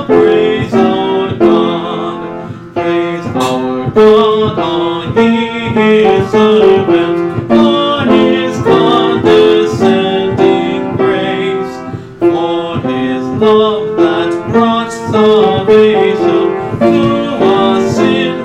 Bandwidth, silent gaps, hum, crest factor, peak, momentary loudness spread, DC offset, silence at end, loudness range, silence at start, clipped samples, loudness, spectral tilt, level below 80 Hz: 10.5 kHz; none; none; 10 dB; 0 dBFS; 8 LU; under 0.1%; 0 s; 4 LU; 0 s; under 0.1%; -10 LUFS; -6.5 dB/octave; -44 dBFS